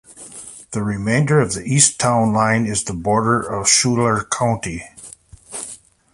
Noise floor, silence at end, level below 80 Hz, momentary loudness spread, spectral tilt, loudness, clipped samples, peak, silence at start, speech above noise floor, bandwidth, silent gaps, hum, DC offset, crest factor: -42 dBFS; 0.4 s; -46 dBFS; 20 LU; -4 dB/octave; -17 LUFS; under 0.1%; 0 dBFS; 0.1 s; 24 dB; 11.5 kHz; none; none; under 0.1%; 20 dB